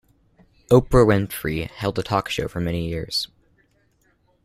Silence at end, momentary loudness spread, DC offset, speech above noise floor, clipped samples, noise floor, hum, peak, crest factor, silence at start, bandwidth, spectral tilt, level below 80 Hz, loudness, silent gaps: 1.2 s; 10 LU; under 0.1%; 43 dB; under 0.1%; -63 dBFS; none; -2 dBFS; 20 dB; 0.7 s; 16 kHz; -6 dB/octave; -38 dBFS; -21 LUFS; none